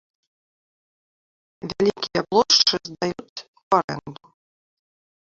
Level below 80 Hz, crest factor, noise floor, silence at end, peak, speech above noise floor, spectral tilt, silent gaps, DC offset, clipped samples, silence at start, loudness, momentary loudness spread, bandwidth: -62 dBFS; 22 dB; under -90 dBFS; 1.1 s; -4 dBFS; over 69 dB; -3 dB/octave; 3.29-3.36 s, 3.48-3.54 s, 3.63-3.71 s, 3.84-3.88 s; under 0.1%; under 0.1%; 1.65 s; -20 LUFS; 22 LU; 7.6 kHz